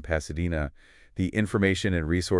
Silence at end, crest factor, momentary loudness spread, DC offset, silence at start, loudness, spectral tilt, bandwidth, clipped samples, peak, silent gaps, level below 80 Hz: 0 s; 16 dB; 9 LU; under 0.1%; 0 s; -27 LUFS; -6 dB/octave; 12 kHz; under 0.1%; -10 dBFS; none; -42 dBFS